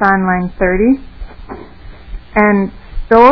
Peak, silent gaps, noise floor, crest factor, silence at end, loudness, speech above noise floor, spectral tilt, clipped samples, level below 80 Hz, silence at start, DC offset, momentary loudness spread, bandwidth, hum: 0 dBFS; none; -34 dBFS; 14 dB; 0 s; -13 LUFS; 21 dB; -9.5 dB/octave; 0.9%; -28 dBFS; 0 s; 1%; 23 LU; 5.4 kHz; 60 Hz at -40 dBFS